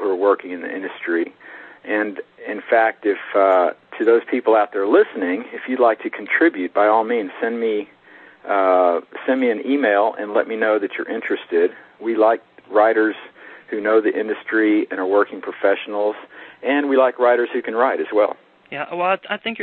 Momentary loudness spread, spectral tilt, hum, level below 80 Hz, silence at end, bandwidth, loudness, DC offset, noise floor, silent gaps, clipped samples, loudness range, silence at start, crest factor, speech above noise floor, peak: 12 LU; -7.5 dB/octave; none; -72 dBFS; 0 s; 4.3 kHz; -19 LUFS; under 0.1%; -46 dBFS; none; under 0.1%; 2 LU; 0 s; 16 dB; 28 dB; -2 dBFS